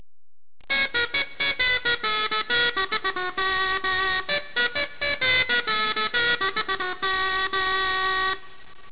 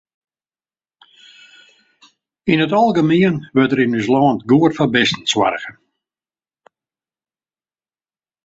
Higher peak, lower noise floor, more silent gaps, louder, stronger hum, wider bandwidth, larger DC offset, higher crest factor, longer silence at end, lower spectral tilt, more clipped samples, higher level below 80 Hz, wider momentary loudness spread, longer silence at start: second, -12 dBFS vs -2 dBFS; about the same, under -90 dBFS vs under -90 dBFS; neither; second, -23 LUFS vs -15 LUFS; neither; second, 4 kHz vs 8 kHz; first, 1% vs under 0.1%; about the same, 14 dB vs 18 dB; second, 0 s vs 2.75 s; second, 1.5 dB/octave vs -5.5 dB/octave; neither; first, -52 dBFS vs -58 dBFS; about the same, 5 LU vs 5 LU; second, 0.6 s vs 2.45 s